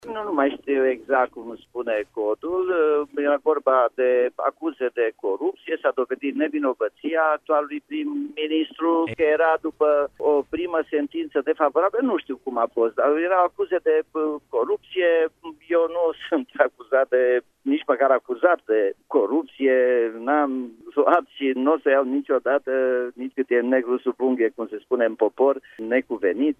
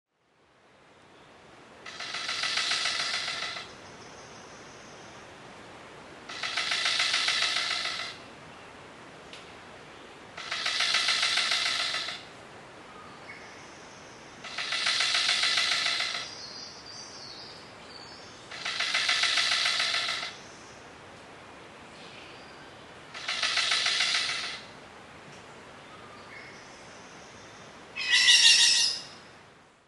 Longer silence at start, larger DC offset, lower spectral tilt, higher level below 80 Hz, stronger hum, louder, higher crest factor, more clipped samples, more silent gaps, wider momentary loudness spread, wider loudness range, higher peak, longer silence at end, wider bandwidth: second, 0.05 s vs 1.2 s; neither; first, -6.5 dB/octave vs 1 dB/octave; about the same, -66 dBFS vs -70 dBFS; neither; first, -22 LUFS vs -25 LUFS; second, 20 dB vs 26 dB; neither; neither; second, 7 LU vs 24 LU; second, 3 LU vs 10 LU; first, -2 dBFS vs -6 dBFS; second, 0.05 s vs 0.45 s; second, 3.7 kHz vs 11.5 kHz